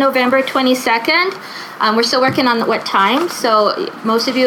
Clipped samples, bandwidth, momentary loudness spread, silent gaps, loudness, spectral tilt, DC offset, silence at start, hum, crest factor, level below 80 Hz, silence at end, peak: under 0.1%; 18 kHz; 5 LU; none; -14 LUFS; -3.5 dB/octave; under 0.1%; 0 s; none; 12 dB; -66 dBFS; 0 s; -2 dBFS